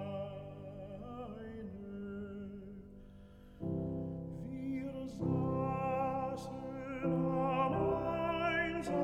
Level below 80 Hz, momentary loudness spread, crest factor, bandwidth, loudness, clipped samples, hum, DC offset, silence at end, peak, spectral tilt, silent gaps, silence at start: -58 dBFS; 15 LU; 16 dB; 10.5 kHz; -38 LUFS; under 0.1%; none; under 0.1%; 0 s; -22 dBFS; -7.5 dB/octave; none; 0 s